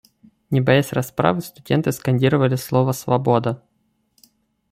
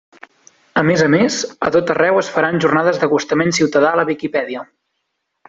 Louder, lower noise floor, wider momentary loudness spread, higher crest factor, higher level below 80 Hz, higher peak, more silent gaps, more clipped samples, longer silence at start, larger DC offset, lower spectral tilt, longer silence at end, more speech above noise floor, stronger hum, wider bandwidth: second, -20 LUFS vs -16 LUFS; second, -67 dBFS vs -73 dBFS; about the same, 7 LU vs 7 LU; about the same, 18 dB vs 14 dB; about the same, -56 dBFS vs -56 dBFS; about the same, -2 dBFS vs -2 dBFS; neither; neither; second, 0.5 s vs 0.75 s; neither; first, -6.5 dB/octave vs -5 dB/octave; first, 1.15 s vs 0.85 s; second, 49 dB vs 57 dB; neither; first, 16 kHz vs 8 kHz